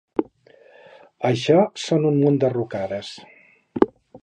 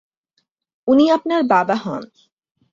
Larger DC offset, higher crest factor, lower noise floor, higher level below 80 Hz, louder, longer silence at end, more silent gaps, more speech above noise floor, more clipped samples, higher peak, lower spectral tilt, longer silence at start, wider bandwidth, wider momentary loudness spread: neither; about the same, 22 dB vs 18 dB; second, -52 dBFS vs -70 dBFS; about the same, -60 dBFS vs -62 dBFS; second, -21 LUFS vs -17 LUFS; second, 0.05 s vs 0.65 s; neither; second, 32 dB vs 54 dB; neither; about the same, 0 dBFS vs -2 dBFS; about the same, -7 dB/octave vs -6.5 dB/octave; second, 0.2 s vs 0.85 s; first, 9.8 kHz vs 7.6 kHz; first, 18 LU vs 14 LU